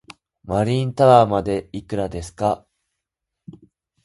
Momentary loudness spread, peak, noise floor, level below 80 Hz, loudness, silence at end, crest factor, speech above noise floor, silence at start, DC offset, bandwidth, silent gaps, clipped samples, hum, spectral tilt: 15 LU; 0 dBFS; -82 dBFS; -46 dBFS; -19 LUFS; 1.5 s; 22 dB; 64 dB; 0.45 s; under 0.1%; 11.5 kHz; none; under 0.1%; none; -7 dB/octave